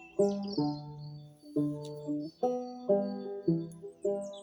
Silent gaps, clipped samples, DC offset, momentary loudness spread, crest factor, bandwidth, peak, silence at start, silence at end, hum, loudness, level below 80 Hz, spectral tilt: none; under 0.1%; under 0.1%; 14 LU; 18 dB; 19.5 kHz; -16 dBFS; 0 s; 0 s; none; -34 LUFS; -70 dBFS; -8 dB/octave